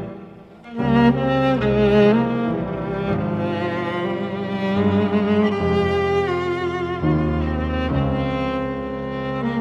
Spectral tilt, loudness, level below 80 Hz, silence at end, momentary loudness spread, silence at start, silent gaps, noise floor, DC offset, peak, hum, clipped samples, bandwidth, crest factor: -8.5 dB/octave; -20 LUFS; -36 dBFS; 0 s; 9 LU; 0 s; none; -40 dBFS; under 0.1%; -4 dBFS; none; under 0.1%; 7.6 kHz; 16 dB